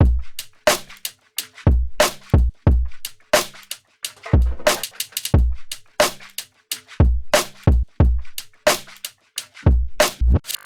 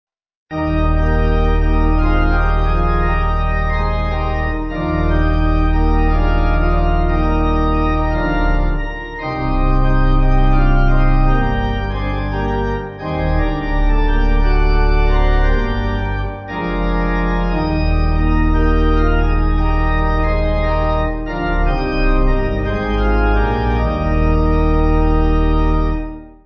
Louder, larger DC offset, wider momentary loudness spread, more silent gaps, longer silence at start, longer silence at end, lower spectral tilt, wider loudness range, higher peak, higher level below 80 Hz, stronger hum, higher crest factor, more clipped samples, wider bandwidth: about the same, -20 LUFS vs -18 LUFS; neither; first, 14 LU vs 5 LU; neither; second, 0 s vs 0.5 s; about the same, 0.1 s vs 0.15 s; second, -4.5 dB/octave vs -9 dB/octave; about the same, 2 LU vs 2 LU; about the same, -4 dBFS vs -2 dBFS; second, -24 dBFS vs -16 dBFS; neither; about the same, 14 dB vs 12 dB; neither; first, 20 kHz vs 6 kHz